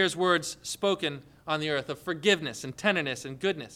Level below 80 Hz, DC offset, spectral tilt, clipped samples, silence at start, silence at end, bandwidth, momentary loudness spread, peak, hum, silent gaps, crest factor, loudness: -66 dBFS; under 0.1%; -3.5 dB/octave; under 0.1%; 0 s; 0 s; 16 kHz; 9 LU; -10 dBFS; none; none; 20 dB; -29 LUFS